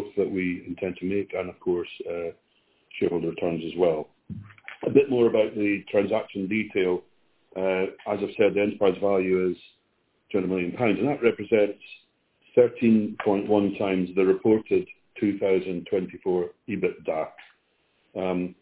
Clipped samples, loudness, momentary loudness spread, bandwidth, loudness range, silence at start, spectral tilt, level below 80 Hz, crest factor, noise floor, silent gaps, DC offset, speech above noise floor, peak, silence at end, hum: under 0.1%; -25 LUFS; 11 LU; 4 kHz; 6 LU; 0 s; -11 dB/octave; -60 dBFS; 22 dB; -70 dBFS; none; under 0.1%; 46 dB; -4 dBFS; 0.1 s; none